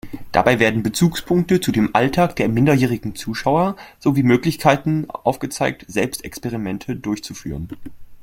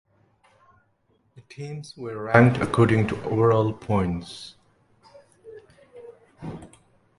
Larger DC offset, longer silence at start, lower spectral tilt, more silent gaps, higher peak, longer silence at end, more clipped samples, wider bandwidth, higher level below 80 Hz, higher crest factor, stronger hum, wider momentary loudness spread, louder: neither; second, 0.05 s vs 1.35 s; second, -6 dB/octave vs -7.5 dB/octave; neither; about the same, 0 dBFS vs 0 dBFS; second, 0 s vs 0.5 s; neither; first, 16.5 kHz vs 11.5 kHz; first, -44 dBFS vs -50 dBFS; second, 18 dB vs 24 dB; neither; second, 11 LU vs 22 LU; first, -19 LUFS vs -22 LUFS